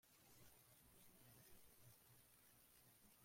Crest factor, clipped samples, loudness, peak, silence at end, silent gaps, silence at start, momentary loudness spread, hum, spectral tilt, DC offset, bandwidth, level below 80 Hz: 16 dB; under 0.1%; -69 LUFS; -54 dBFS; 0 s; none; 0.05 s; 2 LU; none; -3 dB/octave; under 0.1%; 16.5 kHz; -84 dBFS